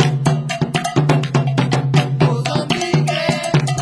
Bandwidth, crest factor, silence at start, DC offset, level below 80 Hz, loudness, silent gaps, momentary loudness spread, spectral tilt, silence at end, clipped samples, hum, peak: 11 kHz; 16 dB; 0 s; under 0.1%; -48 dBFS; -17 LUFS; none; 3 LU; -6 dB/octave; 0 s; under 0.1%; none; -2 dBFS